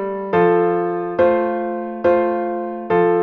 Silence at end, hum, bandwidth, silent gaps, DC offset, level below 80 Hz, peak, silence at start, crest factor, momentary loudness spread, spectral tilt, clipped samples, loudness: 0 s; none; 4.9 kHz; none; under 0.1%; -56 dBFS; -4 dBFS; 0 s; 14 dB; 8 LU; -9.5 dB/octave; under 0.1%; -18 LUFS